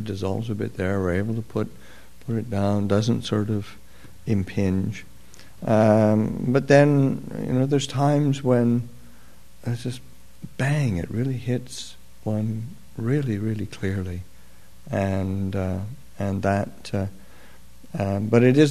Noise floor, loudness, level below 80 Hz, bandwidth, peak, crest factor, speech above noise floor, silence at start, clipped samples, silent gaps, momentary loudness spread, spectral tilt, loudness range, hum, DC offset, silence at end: -51 dBFS; -24 LUFS; -52 dBFS; 13.5 kHz; -2 dBFS; 22 dB; 29 dB; 0 s; under 0.1%; none; 16 LU; -7 dB/octave; 8 LU; none; 1%; 0 s